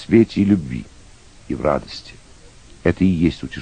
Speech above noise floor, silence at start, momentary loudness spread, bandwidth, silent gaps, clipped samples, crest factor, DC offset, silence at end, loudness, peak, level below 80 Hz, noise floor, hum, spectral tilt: 26 dB; 0 s; 15 LU; 9.6 kHz; none; under 0.1%; 18 dB; under 0.1%; 0 s; -19 LUFS; -2 dBFS; -40 dBFS; -44 dBFS; none; -7.5 dB/octave